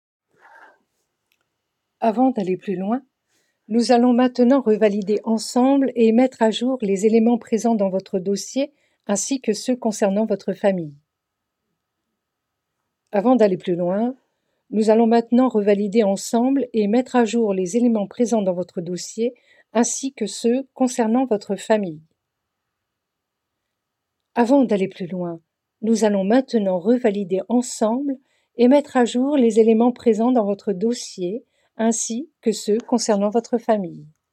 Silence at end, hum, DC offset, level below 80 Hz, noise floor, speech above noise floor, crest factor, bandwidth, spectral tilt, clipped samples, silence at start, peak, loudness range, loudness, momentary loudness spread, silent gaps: 0.25 s; none; under 0.1%; -74 dBFS; -80 dBFS; 61 dB; 16 dB; 13 kHz; -5.5 dB/octave; under 0.1%; 2 s; -4 dBFS; 6 LU; -20 LUFS; 10 LU; none